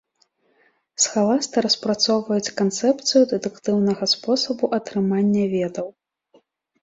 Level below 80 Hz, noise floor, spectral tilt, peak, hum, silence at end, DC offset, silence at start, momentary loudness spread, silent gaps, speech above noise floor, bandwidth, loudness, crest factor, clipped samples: -64 dBFS; -65 dBFS; -4 dB/octave; -6 dBFS; none; 0.9 s; under 0.1%; 1 s; 7 LU; none; 44 dB; 7.8 kHz; -20 LUFS; 16 dB; under 0.1%